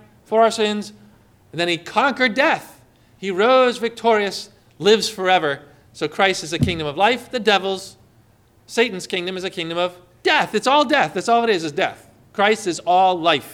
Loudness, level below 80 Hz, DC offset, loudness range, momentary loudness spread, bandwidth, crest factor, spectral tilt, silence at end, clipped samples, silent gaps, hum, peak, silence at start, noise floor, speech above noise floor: -19 LUFS; -54 dBFS; under 0.1%; 3 LU; 11 LU; 16.5 kHz; 16 dB; -4 dB/octave; 0 s; under 0.1%; none; none; -4 dBFS; 0.3 s; -54 dBFS; 36 dB